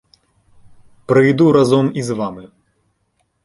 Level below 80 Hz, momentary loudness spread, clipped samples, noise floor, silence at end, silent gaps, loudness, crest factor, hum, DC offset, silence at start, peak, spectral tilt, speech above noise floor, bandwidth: -54 dBFS; 13 LU; under 0.1%; -66 dBFS; 1 s; none; -15 LUFS; 16 dB; none; under 0.1%; 1.1 s; -2 dBFS; -7 dB/octave; 52 dB; 11.5 kHz